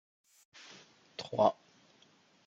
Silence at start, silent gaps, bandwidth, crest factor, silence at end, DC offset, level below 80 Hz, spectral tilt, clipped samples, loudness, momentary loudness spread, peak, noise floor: 1.2 s; none; 8.4 kHz; 26 dB; 0.95 s; under 0.1%; -84 dBFS; -5.5 dB/octave; under 0.1%; -32 LUFS; 24 LU; -12 dBFS; -66 dBFS